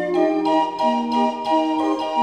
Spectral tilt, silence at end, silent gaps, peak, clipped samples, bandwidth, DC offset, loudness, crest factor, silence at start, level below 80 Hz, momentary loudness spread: -5 dB/octave; 0 s; none; -6 dBFS; under 0.1%; 9.8 kHz; under 0.1%; -20 LUFS; 14 dB; 0 s; -70 dBFS; 2 LU